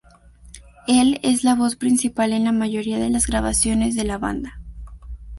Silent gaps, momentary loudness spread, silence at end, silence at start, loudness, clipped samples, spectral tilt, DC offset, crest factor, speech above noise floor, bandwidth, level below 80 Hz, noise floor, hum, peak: none; 20 LU; 0 s; 0.45 s; -20 LUFS; under 0.1%; -4 dB/octave; under 0.1%; 16 dB; 28 dB; 12 kHz; -36 dBFS; -48 dBFS; none; -6 dBFS